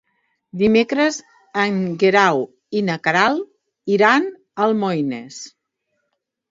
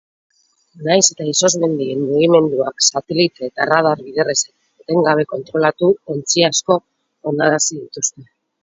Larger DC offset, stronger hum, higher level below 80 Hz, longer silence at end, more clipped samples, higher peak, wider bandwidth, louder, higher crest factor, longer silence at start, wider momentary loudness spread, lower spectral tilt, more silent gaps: neither; neither; about the same, -60 dBFS vs -62 dBFS; first, 1.05 s vs 0.4 s; neither; about the same, 0 dBFS vs 0 dBFS; about the same, 7.8 kHz vs 8 kHz; about the same, -18 LUFS vs -16 LUFS; about the same, 20 dB vs 18 dB; second, 0.55 s vs 0.75 s; first, 18 LU vs 8 LU; first, -5 dB/octave vs -3 dB/octave; neither